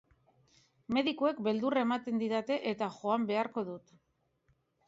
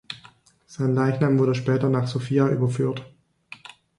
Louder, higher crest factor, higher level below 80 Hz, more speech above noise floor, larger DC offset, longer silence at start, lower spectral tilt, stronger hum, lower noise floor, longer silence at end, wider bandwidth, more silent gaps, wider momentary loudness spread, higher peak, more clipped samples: second, -33 LUFS vs -23 LUFS; about the same, 18 dB vs 16 dB; second, -74 dBFS vs -62 dBFS; first, 43 dB vs 32 dB; neither; first, 0.9 s vs 0.1 s; second, -6 dB/octave vs -8 dB/octave; neither; first, -75 dBFS vs -53 dBFS; first, 1.1 s vs 0.9 s; second, 7.8 kHz vs 11 kHz; neither; second, 6 LU vs 21 LU; second, -16 dBFS vs -8 dBFS; neither